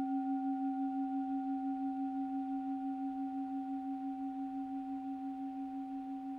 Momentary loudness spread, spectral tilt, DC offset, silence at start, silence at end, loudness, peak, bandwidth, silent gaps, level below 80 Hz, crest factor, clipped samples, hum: 5 LU; -7 dB/octave; under 0.1%; 0 s; 0 s; -39 LUFS; -28 dBFS; 3.9 kHz; none; -76 dBFS; 10 dB; under 0.1%; none